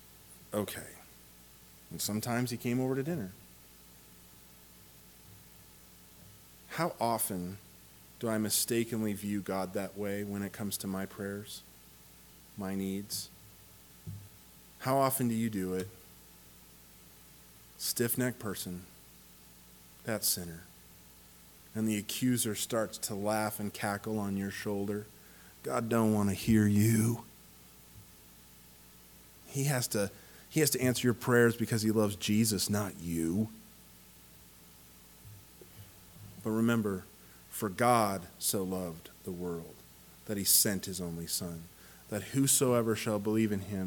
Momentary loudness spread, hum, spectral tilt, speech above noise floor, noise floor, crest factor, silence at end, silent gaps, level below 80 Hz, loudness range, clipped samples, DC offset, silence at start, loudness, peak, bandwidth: 26 LU; 60 Hz at -60 dBFS; -4.5 dB/octave; 25 dB; -57 dBFS; 22 dB; 0 s; none; -64 dBFS; 9 LU; under 0.1%; under 0.1%; 0.15 s; -32 LUFS; -12 dBFS; 19 kHz